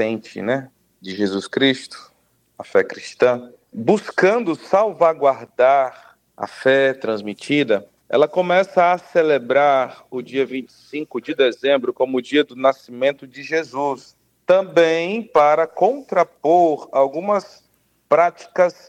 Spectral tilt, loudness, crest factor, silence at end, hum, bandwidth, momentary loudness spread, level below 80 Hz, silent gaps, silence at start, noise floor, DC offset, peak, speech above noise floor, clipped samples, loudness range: -5.5 dB/octave; -19 LUFS; 16 dB; 0.15 s; none; 10 kHz; 11 LU; -70 dBFS; none; 0 s; -62 dBFS; under 0.1%; -2 dBFS; 44 dB; under 0.1%; 3 LU